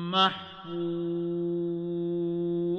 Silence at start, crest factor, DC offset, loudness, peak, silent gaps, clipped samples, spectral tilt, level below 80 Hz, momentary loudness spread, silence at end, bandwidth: 0 s; 18 dB; under 0.1%; -30 LUFS; -12 dBFS; none; under 0.1%; -7 dB/octave; -66 dBFS; 9 LU; 0 s; 6.6 kHz